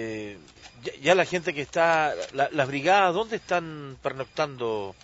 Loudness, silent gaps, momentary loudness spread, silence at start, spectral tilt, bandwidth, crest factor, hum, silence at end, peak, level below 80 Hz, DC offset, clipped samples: -25 LUFS; none; 16 LU; 0 s; -4.5 dB/octave; 8 kHz; 20 dB; none; 0.1 s; -6 dBFS; -62 dBFS; under 0.1%; under 0.1%